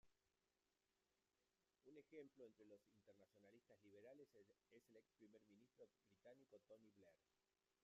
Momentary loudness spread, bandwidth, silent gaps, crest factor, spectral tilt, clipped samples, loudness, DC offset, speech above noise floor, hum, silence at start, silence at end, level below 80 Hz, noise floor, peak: 5 LU; 7.2 kHz; none; 22 dB; -5.5 dB/octave; under 0.1%; -67 LUFS; under 0.1%; over 20 dB; none; 0.05 s; 0 s; under -90 dBFS; under -90 dBFS; -50 dBFS